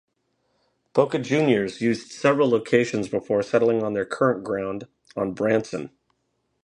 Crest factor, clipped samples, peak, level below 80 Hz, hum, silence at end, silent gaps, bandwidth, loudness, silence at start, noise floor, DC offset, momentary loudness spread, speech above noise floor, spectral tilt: 20 dB; under 0.1%; -4 dBFS; -62 dBFS; none; 0.8 s; none; 10.5 kHz; -23 LUFS; 0.95 s; -73 dBFS; under 0.1%; 11 LU; 51 dB; -6 dB/octave